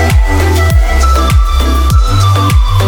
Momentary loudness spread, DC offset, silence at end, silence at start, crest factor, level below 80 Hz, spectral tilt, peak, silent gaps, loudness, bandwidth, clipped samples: 1 LU; under 0.1%; 0 s; 0 s; 8 dB; -10 dBFS; -5.5 dB/octave; 0 dBFS; none; -10 LUFS; 19 kHz; under 0.1%